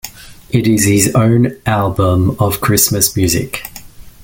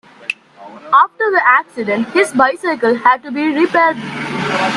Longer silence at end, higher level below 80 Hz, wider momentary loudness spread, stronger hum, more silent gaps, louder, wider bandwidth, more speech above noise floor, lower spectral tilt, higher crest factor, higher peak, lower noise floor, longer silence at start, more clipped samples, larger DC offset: first, 0.15 s vs 0 s; first, -38 dBFS vs -60 dBFS; about the same, 10 LU vs 11 LU; neither; neither; about the same, -13 LUFS vs -14 LUFS; first, 17 kHz vs 12.5 kHz; about the same, 21 dB vs 23 dB; about the same, -4.5 dB/octave vs -4.5 dB/octave; about the same, 14 dB vs 14 dB; about the same, 0 dBFS vs 0 dBFS; about the same, -34 dBFS vs -37 dBFS; second, 0.05 s vs 0.2 s; neither; neither